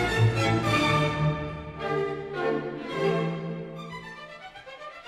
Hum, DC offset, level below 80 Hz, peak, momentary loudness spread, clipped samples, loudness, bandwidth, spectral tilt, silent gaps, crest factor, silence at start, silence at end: none; under 0.1%; -48 dBFS; -10 dBFS; 18 LU; under 0.1%; -27 LUFS; 13.5 kHz; -6 dB/octave; none; 16 dB; 0 s; 0 s